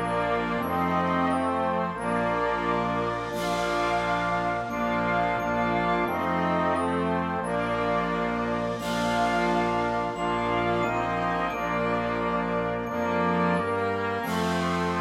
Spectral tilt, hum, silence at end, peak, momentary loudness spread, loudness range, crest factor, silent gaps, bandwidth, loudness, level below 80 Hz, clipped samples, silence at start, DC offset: -6 dB/octave; none; 0 s; -12 dBFS; 3 LU; 1 LU; 14 dB; none; 15.5 kHz; -26 LUFS; -48 dBFS; under 0.1%; 0 s; under 0.1%